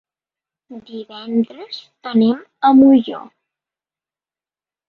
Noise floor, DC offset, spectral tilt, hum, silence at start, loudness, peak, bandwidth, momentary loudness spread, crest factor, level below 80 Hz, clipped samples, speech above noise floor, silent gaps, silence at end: under -90 dBFS; under 0.1%; -8 dB/octave; none; 0.7 s; -15 LUFS; -2 dBFS; 4.9 kHz; 22 LU; 16 dB; -62 dBFS; under 0.1%; over 74 dB; none; 1.7 s